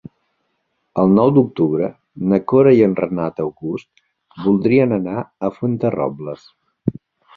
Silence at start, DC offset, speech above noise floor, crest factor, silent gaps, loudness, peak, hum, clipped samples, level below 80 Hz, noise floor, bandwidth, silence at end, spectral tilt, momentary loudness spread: 0.95 s; under 0.1%; 53 dB; 16 dB; none; -17 LUFS; -2 dBFS; none; under 0.1%; -54 dBFS; -70 dBFS; 4.9 kHz; 0.45 s; -10.5 dB/octave; 15 LU